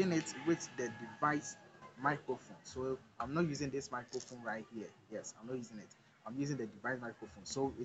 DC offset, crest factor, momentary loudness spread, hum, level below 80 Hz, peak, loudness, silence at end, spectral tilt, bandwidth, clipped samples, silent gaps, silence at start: under 0.1%; 22 dB; 13 LU; none; -70 dBFS; -20 dBFS; -41 LUFS; 0 s; -5 dB/octave; 8.8 kHz; under 0.1%; none; 0 s